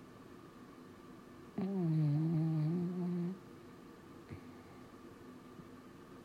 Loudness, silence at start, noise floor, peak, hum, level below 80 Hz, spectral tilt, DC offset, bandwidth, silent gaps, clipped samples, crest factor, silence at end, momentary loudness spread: -37 LUFS; 0 s; -55 dBFS; -26 dBFS; none; -74 dBFS; -9.5 dB/octave; under 0.1%; 8.2 kHz; none; under 0.1%; 14 dB; 0 s; 21 LU